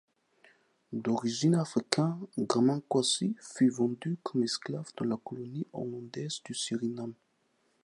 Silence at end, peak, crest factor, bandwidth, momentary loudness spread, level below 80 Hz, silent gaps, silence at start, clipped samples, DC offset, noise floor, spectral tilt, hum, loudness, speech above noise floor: 0.7 s; -4 dBFS; 28 dB; 11.5 kHz; 11 LU; -78 dBFS; none; 0.9 s; under 0.1%; under 0.1%; -73 dBFS; -5 dB/octave; none; -32 LUFS; 42 dB